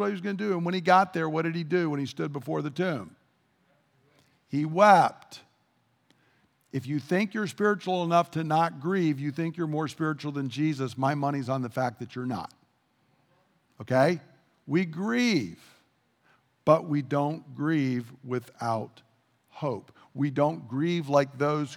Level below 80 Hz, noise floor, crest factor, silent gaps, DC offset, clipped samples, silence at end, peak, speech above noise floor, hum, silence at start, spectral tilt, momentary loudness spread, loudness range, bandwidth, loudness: -78 dBFS; -70 dBFS; 24 dB; none; under 0.1%; under 0.1%; 0 s; -4 dBFS; 43 dB; none; 0 s; -6.5 dB/octave; 12 LU; 5 LU; 16 kHz; -27 LUFS